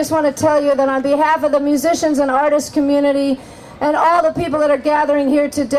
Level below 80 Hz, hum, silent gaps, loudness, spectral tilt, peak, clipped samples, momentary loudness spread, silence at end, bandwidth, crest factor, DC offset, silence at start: -48 dBFS; none; none; -15 LUFS; -4.5 dB/octave; -2 dBFS; under 0.1%; 4 LU; 0 s; 15 kHz; 14 dB; under 0.1%; 0 s